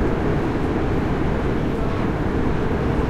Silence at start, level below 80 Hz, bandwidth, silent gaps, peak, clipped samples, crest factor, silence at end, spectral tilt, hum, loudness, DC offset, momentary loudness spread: 0 s; -28 dBFS; 13.5 kHz; none; -8 dBFS; under 0.1%; 12 dB; 0 s; -8 dB/octave; none; -22 LUFS; under 0.1%; 1 LU